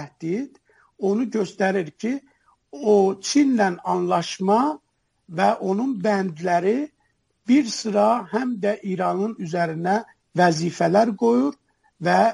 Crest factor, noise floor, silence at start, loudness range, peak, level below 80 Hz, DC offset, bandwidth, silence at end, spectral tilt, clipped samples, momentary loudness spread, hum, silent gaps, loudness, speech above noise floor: 16 dB; -69 dBFS; 0 s; 2 LU; -6 dBFS; -70 dBFS; under 0.1%; 11.5 kHz; 0 s; -5.5 dB/octave; under 0.1%; 9 LU; none; none; -22 LUFS; 48 dB